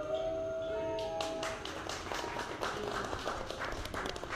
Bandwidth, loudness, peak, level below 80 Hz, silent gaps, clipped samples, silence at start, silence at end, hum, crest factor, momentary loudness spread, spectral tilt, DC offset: 16 kHz; -38 LUFS; -20 dBFS; -52 dBFS; none; under 0.1%; 0 s; 0 s; none; 18 dB; 3 LU; -3.5 dB/octave; under 0.1%